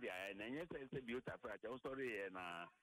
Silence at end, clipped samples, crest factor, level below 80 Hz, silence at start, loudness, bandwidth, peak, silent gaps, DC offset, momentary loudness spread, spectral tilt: 0.1 s; under 0.1%; 14 dB; -76 dBFS; 0 s; -49 LUFS; 16 kHz; -36 dBFS; none; under 0.1%; 5 LU; -5.5 dB/octave